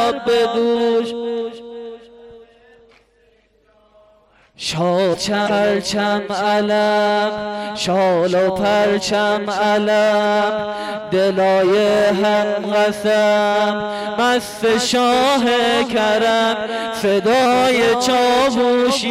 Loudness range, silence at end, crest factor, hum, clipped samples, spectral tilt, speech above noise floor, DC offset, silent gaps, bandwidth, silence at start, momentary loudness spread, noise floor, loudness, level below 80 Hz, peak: 8 LU; 0 s; 8 dB; none; under 0.1%; -4 dB/octave; 40 dB; under 0.1%; none; 15.5 kHz; 0 s; 8 LU; -56 dBFS; -16 LUFS; -52 dBFS; -8 dBFS